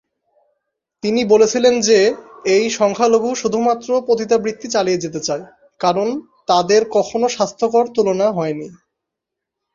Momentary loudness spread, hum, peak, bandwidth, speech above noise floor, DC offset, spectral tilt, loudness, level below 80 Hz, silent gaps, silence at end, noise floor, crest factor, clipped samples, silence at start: 10 LU; none; -2 dBFS; 7.6 kHz; 66 dB; under 0.1%; -4 dB/octave; -17 LUFS; -60 dBFS; none; 1 s; -82 dBFS; 16 dB; under 0.1%; 1.05 s